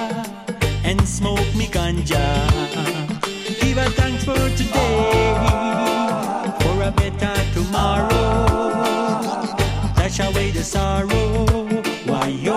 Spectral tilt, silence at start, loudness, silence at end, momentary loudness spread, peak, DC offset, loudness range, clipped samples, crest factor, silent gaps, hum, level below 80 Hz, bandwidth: -5.5 dB/octave; 0 s; -20 LUFS; 0 s; 5 LU; -4 dBFS; under 0.1%; 1 LU; under 0.1%; 14 dB; none; none; -26 dBFS; 15.5 kHz